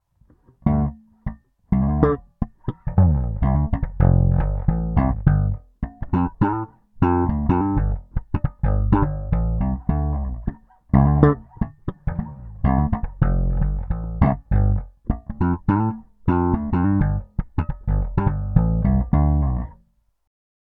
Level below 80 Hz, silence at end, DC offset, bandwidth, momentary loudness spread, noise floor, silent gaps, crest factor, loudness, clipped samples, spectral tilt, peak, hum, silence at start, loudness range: -26 dBFS; 1.05 s; under 0.1%; 3.8 kHz; 11 LU; -61 dBFS; none; 20 dB; -22 LUFS; under 0.1%; -12.5 dB/octave; 0 dBFS; none; 0.65 s; 2 LU